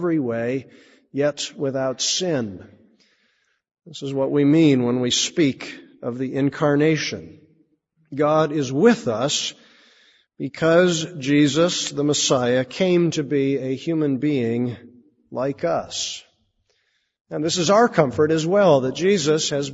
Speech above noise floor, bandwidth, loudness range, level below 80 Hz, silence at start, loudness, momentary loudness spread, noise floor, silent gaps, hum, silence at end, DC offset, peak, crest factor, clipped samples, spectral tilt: 49 dB; 8 kHz; 6 LU; -62 dBFS; 0 s; -20 LUFS; 15 LU; -69 dBFS; 17.21-17.25 s; none; 0 s; under 0.1%; -2 dBFS; 20 dB; under 0.1%; -4.5 dB/octave